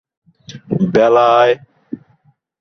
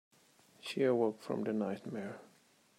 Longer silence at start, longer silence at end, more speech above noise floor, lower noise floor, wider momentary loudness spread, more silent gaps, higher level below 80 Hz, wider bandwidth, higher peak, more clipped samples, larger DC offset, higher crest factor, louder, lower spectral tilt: second, 0.5 s vs 0.65 s; first, 0.65 s vs 0.5 s; first, 43 dB vs 33 dB; second, -56 dBFS vs -68 dBFS; first, 22 LU vs 16 LU; neither; first, -54 dBFS vs -88 dBFS; second, 6.6 kHz vs 15.5 kHz; first, -2 dBFS vs -20 dBFS; neither; neither; about the same, 14 dB vs 18 dB; first, -13 LUFS vs -36 LUFS; about the same, -7 dB/octave vs -6.5 dB/octave